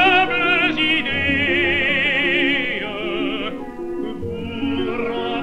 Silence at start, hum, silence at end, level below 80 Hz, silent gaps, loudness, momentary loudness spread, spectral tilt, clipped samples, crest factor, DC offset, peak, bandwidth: 0 s; none; 0 s; -44 dBFS; none; -19 LUFS; 12 LU; -5.5 dB/octave; under 0.1%; 18 dB; under 0.1%; -2 dBFS; 10 kHz